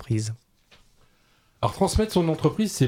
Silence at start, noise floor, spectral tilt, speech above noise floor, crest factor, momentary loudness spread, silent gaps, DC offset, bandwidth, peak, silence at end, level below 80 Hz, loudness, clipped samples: 0 s; -62 dBFS; -6 dB/octave; 39 dB; 18 dB; 10 LU; none; under 0.1%; 16.5 kHz; -8 dBFS; 0 s; -40 dBFS; -25 LUFS; under 0.1%